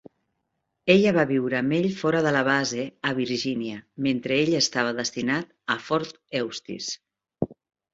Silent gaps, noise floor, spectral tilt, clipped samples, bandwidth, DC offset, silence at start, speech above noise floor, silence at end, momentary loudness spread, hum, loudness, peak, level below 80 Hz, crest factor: none; -78 dBFS; -4.5 dB/octave; under 0.1%; 8 kHz; under 0.1%; 0.85 s; 54 dB; 0.4 s; 12 LU; none; -25 LUFS; -4 dBFS; -62 dBFS; 22 dB